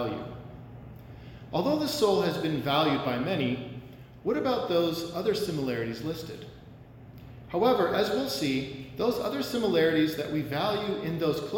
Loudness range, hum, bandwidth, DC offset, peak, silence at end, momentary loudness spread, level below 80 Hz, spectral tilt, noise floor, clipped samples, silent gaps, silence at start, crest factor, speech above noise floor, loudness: 3 LU; none; 17 kHz; under 0.1%; -12 dBFS; 0 s; 21 LU; -56 dBFS; -5.5 dB/octave; -48 dBFS; under 0.1%; none; 0 s; 18 dB; 21 dB; -28 LUFS